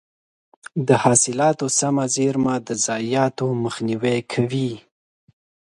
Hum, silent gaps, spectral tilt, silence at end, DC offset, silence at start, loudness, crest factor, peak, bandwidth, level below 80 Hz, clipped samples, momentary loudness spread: none; none; -4.5 dB/octave; 1 s; under 0.1%; 0.75 s; -20 LUFS; 20 dB; -2 dBFS; 11.5 kHz; -60 dBFS; under 0.1%; 9 LU